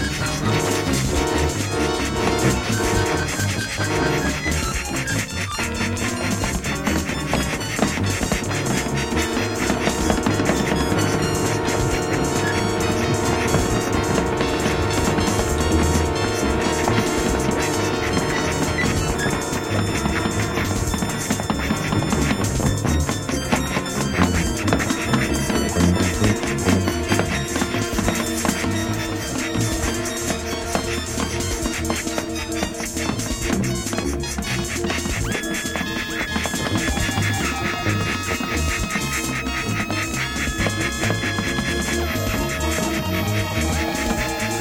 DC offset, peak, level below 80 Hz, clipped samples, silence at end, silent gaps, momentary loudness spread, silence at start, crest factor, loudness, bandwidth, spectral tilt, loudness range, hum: under 0.1%; -4 dBFS; -32 dBFS; under 0.1%; 0 s; none; 4 LU; 0 s; 18 dB; -21 LUFS; 17 kHz; -4.5 dB/octave; 3 LU; none